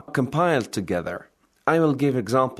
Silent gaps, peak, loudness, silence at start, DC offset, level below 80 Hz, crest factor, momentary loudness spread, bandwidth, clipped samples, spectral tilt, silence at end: none; -4 dBFS; -23 LUFS; 0.1 s; under 0.1%; -60 dBFS; 18 dB; 8 LU; 13.5 kHz; under 0.1%; -6.5 dB/octave; 0.05 s